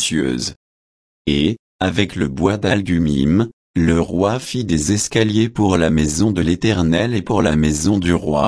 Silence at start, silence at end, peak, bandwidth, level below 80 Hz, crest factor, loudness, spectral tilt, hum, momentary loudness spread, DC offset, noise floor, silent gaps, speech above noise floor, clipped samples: 0 s; 0 s; -2 dBFS; 11 kHz; -34 dBFS; 14 dB; -17 LUFS; -5.5 dB/octave; none; 5 LU; under 0.1%; under -90 dBFS; 0.56-1.25 s, 1.59-1.79 s, 3.53-3.74 s; over 74 dB; under 0.1%